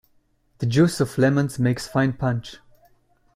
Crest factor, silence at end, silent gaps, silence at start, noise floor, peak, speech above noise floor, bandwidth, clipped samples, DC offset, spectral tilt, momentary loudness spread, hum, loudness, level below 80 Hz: 16 dB; 0.8 s; none; 0.6 s; -63 dBFS; -6 dBFS; 42 dB; 15.5 kHz; under 0.1%; under 0.1%; -6.5 dB/octave; 10 LU; none; -22 LUFS; -52 dBFS